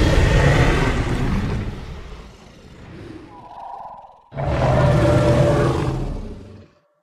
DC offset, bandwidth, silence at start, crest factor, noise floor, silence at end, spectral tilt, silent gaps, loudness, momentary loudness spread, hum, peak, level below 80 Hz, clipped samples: under 0.1%; 12.5 kHz; 0 s; 14 dB; -46 dBFS; 0.4 s; -7 dB/octave; none; -19 LUFS; 23 LU; none; -4 dBFS; -26 dBFS; under 0.1%